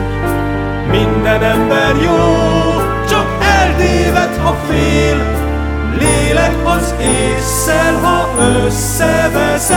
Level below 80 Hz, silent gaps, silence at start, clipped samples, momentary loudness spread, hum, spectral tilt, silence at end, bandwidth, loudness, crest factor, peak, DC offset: -20 dBFS; none; 0 s; under 0.1%; 5 LU; none; -4.5 dB/octave; 0 s; 19 kHz; -12 LUFS; 12 dB; 0 dBFS; under 0.1%